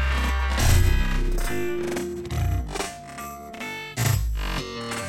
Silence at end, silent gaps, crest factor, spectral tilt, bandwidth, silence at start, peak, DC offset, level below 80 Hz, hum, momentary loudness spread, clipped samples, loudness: 0 s; none; 16 dB; -4.5 dB/octave; 16 kHz; 0 s; -8 dBFS; under 0.1%; -26 dBFS; none; 13 LU; under 0.1%; -26 LUFS